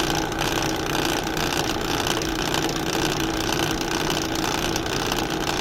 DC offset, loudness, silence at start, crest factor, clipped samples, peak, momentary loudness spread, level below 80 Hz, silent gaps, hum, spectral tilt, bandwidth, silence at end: under 0.1%; -23 LUFS; 0 s; 18 dB; under 0.1%; -6 dBFS; 1 LU; -38 dBFS; none; none; -3.5 dB/octave; 16.5 kHz; 0 s